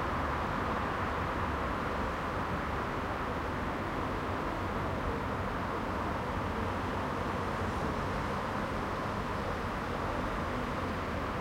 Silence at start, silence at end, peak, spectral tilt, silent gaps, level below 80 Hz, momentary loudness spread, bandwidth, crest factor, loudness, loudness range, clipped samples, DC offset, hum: 0 s; 0 s; -20 dBFS; -6.5 dB/octave; none; -44 dBFS; 2 LU; 16.5 kHz; 14 dB; -34 LUFS; 1 LU; under 0.1%; under 0.1%; none